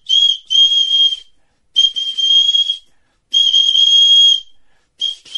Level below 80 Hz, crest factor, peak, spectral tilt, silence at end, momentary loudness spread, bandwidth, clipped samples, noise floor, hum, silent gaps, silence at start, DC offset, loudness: -56 dBFS; 12 dB; -2 dBFS; 4.5 dB/octave; 0 s; 14 LU; 10.5 kHz; under 0.1%; -55 dBFS; none; none; 0.1 s; under 0.1%; -10 LUFS